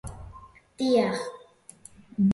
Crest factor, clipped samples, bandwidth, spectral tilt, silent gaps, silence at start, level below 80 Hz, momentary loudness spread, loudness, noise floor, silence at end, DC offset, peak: 16 dB; under 0.1%; 11.5 kHz; -6.5 dB/octave; none; 0.05 s; -52 dBFS; 24 LU; -27 LUFS; -52 dBFS; 0 s; under 0.1%; -12 dBFS